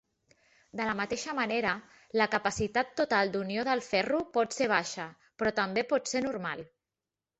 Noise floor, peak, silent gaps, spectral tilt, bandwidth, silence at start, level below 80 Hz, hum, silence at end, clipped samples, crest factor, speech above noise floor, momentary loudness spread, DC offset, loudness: under -90 dBFS; -10 dBFS; none; -3.5 dB/octave; 8.2 kHz; 0.75 s; -62 dBFS; none; 0.75 s; under 0.1%; 20 dB; over 59 dB; 10 LU; under 0.1%; -30 LUFS